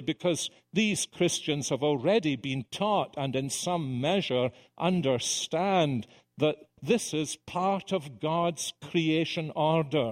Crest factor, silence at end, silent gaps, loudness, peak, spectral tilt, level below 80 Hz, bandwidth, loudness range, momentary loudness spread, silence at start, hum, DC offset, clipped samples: 18 dB; 0 s; none; -29 LUFS; -10 dBFS; -4.5 dB/octave; -68 dBFS; 16 kHz; 1 LU; 6 LU; 0 s; none; under 0.1%; under 0.1%